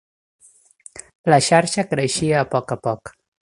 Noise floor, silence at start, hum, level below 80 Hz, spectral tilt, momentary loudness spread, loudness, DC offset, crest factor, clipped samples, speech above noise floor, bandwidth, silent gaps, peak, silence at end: -48 dBFS; 0.95 s; none; -54 dBFS; -4.5 dB/octave; 22 LU; -19 LUFS; under 0.1%; 20 dB; under 0.1%; 30 dB; 11.5 kHz; 1.15-1.24 s; 0 dBFS; 0.35 s